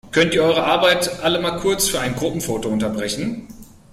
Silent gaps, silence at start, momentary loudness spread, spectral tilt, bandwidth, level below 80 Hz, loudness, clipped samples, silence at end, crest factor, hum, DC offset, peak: none; 0.05 s; 8 LU; -3.5 dB/octave; 16 kHz; -46 dBFS; -19 LUFS; under 0.1%; 0.3 s; 16 dB; none; under 0.1%; -4 dBFS